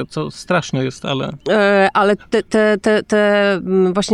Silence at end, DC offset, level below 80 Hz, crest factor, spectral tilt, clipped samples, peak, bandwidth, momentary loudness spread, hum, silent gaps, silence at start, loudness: 0 s; under 0.1%; -50 dBFS; 12 dB; -5.5 dB/octave; under 0.1%; -4 dBFS; 11.5 kHz; 9 LU; none; none; 0 s; -16 LUFS